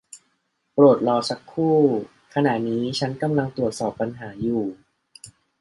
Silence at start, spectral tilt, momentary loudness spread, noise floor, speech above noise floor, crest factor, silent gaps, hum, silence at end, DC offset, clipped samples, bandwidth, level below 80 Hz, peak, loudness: 0.15 s; -6.5 dB/octave; 12 LU; -71 dBFS; 50 dB; 18 dB; none; none; 0.3 s; under 0.1%; under 0.1%; 11.5 kHz; -58 dBFS; -4 dBFS; -22 LUFS